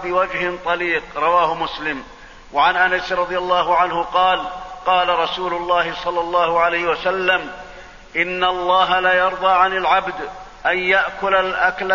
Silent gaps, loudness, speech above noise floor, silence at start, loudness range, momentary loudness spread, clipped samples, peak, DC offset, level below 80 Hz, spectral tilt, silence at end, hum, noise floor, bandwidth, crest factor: none; -18 LUFS; 21 dB; 0 s; 2 LU; 10 LU; under 0.1%; -2 dBFS; 0.2%; -46 dBFS; -4 dB/octave; 0 s; none; -39 dBFS; 7.4 kHz; 16 dB